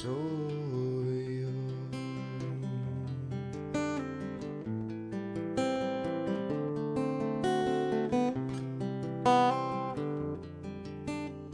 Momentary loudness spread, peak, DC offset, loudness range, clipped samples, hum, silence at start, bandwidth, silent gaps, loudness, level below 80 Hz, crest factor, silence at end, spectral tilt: 9 LU; -12 dBFS; under 0.1%; 6 LU; under 0.1%; none; 0 s; 10.5 kHz; none; -34 LUFS; -62 dBFS; 22 dB; 0 s; -7 dB/octave